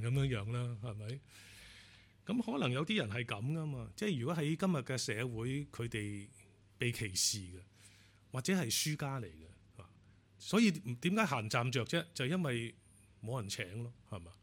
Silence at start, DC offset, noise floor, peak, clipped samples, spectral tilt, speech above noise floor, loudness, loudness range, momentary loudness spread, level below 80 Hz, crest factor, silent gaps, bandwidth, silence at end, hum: 0 s; under 0.1%; -64 dBFS; -18 dBFS; under 0.1%; -4.5 dB/octave; 27 dB; -37 LUFS; 4 LU; 17 LU; -66 dBFS; 20 dB; none; 17 kHz; 0.1 s; none